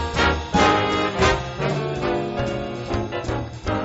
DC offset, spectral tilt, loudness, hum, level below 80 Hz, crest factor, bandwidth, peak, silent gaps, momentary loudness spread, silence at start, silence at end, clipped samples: under 0.1%; -4 dB/octave; -22 LUFS; none; -34 dBFS; 20 dB; 8 kHz; -2 dBFS; none; 9 LU; 0 s; 0 s; under 0.1%